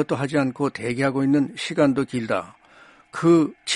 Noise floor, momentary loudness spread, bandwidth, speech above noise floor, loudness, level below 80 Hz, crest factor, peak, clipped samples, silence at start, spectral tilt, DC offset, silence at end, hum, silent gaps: -51 dBFS; 8 LU; 11.5 kHz; 30 dB; -22 LUFS; -60 dBFS; 18 dB; -4 dBFS; under 0.1%; 0 s; -5.5 dB/octave; under 0.1%; 0 s; none; none